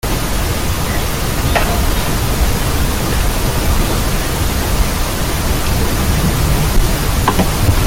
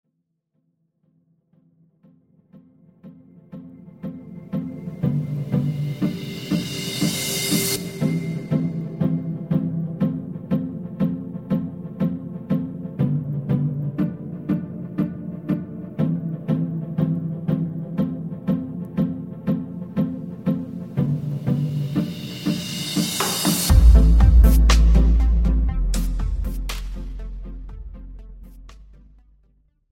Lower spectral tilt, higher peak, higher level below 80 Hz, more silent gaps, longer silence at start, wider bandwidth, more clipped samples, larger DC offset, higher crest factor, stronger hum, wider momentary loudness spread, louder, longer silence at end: about the same, -4.5 dB/octave vs -5.5 dB/octave; about the same, 0 dBFS vs -2 dBFS; first, -18 dBFS vs -24 dBFS; neither; second, 0.05 s vs 2.55 s; about the same, 17 kHz vs 17 kHz; neither; neither; second, 12 dB vs 20 dB; neither; second, 3 LU vs 16 LU; first, -16 LUFS vs -23 LUFS; second, 0 s vs 0.95 s